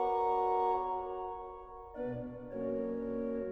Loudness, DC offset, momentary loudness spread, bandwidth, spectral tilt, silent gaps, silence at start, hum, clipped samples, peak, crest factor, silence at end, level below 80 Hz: -36 LUFS; under 0.1%; 14 LU; 5.8 kHz; -9 dB/octave; none; 0 s; none; under 0.1%; -22 dBFS; 14 dB; 0 s; -60 dBFS